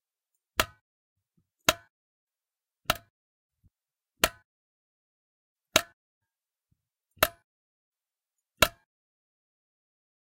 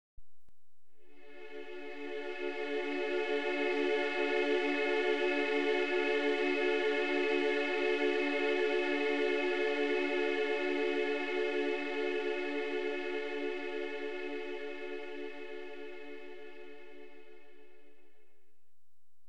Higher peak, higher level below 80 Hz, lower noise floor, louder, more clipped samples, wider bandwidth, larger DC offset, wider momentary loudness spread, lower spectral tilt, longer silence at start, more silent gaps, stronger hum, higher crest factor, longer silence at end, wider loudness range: first, 0 dBFS vs -20 dBFS; first, -54 dBFS vs -78 dBFS; first, under -90 dBFS vs -86 dBFS; first, -29 LUFS vs -33 LUFS; neither; first, 16 kHz vs 9.4 kHz; second, under 0.1% vs 0.6%; second, 8 LU vs 15 LU; second, -1.5 dB/octave vs -3.5 dB/octave; first, 0.6 s vs 0.15 s; first, 0.81-1.16 s, 1.90-2.27 s, 3.10-3.49 s, 4.45-5.56 s, 5.93-6.21 s, 7.44-7.92 s vs none; neither; first, 36 dB vs 14 dB; second, 1.65 s vs 1.9 s; second, 3 LU vs 14 LU